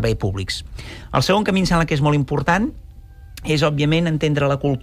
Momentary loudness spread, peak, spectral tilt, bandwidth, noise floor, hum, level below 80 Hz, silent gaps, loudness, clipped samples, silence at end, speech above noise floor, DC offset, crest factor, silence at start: 9 LU; -6 dBFS; -6 dB/octave; 15 kHz; -40 dBFS; none; -36 dBFS; none; -19 LUFS; under 0.1%; 0 s; 21 dB; under 0.1%; 14 dB; 0 s